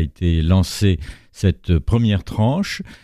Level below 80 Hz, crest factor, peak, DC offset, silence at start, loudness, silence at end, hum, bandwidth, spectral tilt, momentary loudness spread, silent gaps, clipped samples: -30 dBFS; 14 dB; -4 dBFS; under 0.1%; 0 s; -19 LUFS; 0.1 s; none; 14 kHz; -6.5 dB/octave; 7 LU; none; under 0.1%